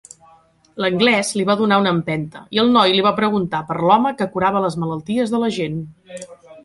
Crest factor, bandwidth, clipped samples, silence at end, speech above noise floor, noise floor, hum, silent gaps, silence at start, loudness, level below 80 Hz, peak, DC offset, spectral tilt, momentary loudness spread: 16 dB; 11.5 kHz; under 0.1%; 0.05 s; 34 dB; -52 dBFS; none; none; 0.75 s; -18 LUFS; -56 dBFS; -2 dBFS; under 0.1%; -5 dB/octave; 16 LU